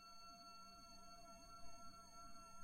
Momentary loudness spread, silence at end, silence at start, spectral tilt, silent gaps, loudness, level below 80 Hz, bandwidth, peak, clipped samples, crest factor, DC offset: 1 LU; 0 s; 0 s; -2.5 dB/octave; none; -60 LUFS; -70 dBFS; 16 kHz; -44 dBFS; under 0.1%; 14 dB; under 0.1%